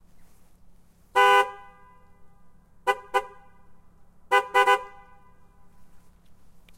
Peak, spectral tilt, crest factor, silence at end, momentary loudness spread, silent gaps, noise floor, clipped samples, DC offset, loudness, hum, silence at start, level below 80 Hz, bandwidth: -6 dBFS; -1.5 dB/octave; 22 dB; 0.8 s; 21 LU; none; -52 dBFS; under 0.1%; under 0.1%; -23 LUFS; none; 1.15 s; -60 dBFS; 16 kHz